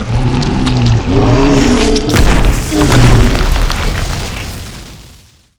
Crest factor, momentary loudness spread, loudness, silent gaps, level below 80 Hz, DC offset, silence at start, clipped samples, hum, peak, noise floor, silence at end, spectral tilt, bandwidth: 10 dB; 13 LU; -11 LUFS; none; -14 dBFS; under 0.1%; 0 s; under 0.1%; none; 0 dBFS; -41 dBFS; 0.55 s; -5.5 dB/octave; over 20 kHz